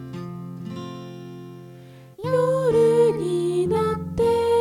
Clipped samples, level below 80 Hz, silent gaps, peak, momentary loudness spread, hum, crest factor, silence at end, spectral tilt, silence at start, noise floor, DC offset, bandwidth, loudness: under 0.1%; -50 dBFS; none; -8 dBFS; 21 LU; none; 14 dB; 0 s; -7 dB/octave; 0 s; -44 dBFS; under 0.1%; 14 kHz; -21 LUFS